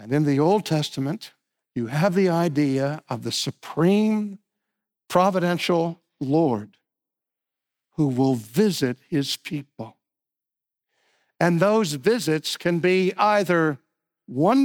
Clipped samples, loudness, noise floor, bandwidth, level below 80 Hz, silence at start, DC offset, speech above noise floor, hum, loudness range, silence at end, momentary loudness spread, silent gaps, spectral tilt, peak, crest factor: under 0.1%; -23 LUFS; -88 dBFS; 19 kHz; -66 dBFS; 0 s; under 0.1%; 67 dB; none; 4 LU; 0 s; 13 LU; none; -6 dB/octave; -6 dBFS; 18 dB